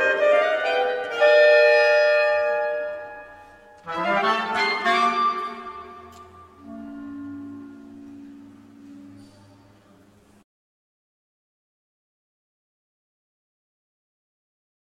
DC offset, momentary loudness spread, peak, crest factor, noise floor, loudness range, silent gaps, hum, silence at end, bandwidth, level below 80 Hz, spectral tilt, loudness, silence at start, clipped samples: under 0.1%; 26 LU; -6 dBFS; 20 dB; -55 dBFS; 22 LU; none; none; 5.8 s; 10 kHz; -68 dBFS; -3.5 dB/octave; -20 LUFS; 0 s; under 0.1%